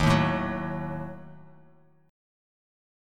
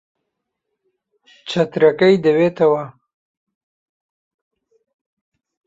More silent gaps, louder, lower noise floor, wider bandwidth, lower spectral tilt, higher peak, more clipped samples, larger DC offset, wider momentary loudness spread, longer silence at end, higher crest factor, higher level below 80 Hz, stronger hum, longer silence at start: neither; second, -29 LUFS vs -16 LUFS; second, -59 dBFS vs -78 dBFS; first, 13 kHz vs 7.8 kHz; about the same, -6.5 dB/octave vs -7 dB/octave; second, -10 dBFS vs -2 dBFS; neither; neither; first, 21 LU vs 15 LU; second, 1 s vs 2.75 s; about the same, 22 dB vs 18 dB; first, -46 dBFS vs -64 dBFS; neither; second, 0 s vs 1.45 s